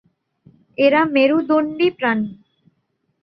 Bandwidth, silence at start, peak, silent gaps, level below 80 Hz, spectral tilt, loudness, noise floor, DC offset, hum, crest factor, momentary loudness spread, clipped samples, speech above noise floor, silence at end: 5.8 kHz; 0.8 s; -2 dBFS; none; -64 dBFS; -8 dB/octave; -17 LUFS; -69 dBFS; under 0.1%; none; 18 dB; 10 LU; under 0.1%; 53 dB; 0.9 s